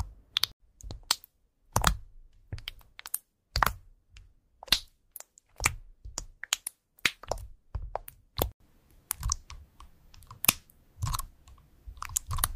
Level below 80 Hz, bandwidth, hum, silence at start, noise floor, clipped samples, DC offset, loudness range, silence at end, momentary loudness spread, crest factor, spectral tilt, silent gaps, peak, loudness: -42 dBFS; 16 kHz; none; 0 s; -65 dBFS; under 0.1%; under 0.1%; 3 LU; 0 s; 20 LU; 30 dB; -1.5 dB/octave; 0.53-0.60 s, 8.54-8.60 s; -6 dBFS; -32 LUFS